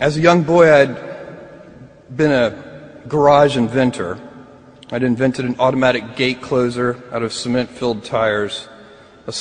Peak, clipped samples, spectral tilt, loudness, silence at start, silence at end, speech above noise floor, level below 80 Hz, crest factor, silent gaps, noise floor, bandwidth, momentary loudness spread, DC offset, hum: 0 dBFS; under 0.1%; -6 dB/octave; -16 LUFS; 0 s; 0 s; 27 dB; -50 dBFS; 18 dB; none; -43 dBFS; 10 kHz; 20 LU; under 0.1%; none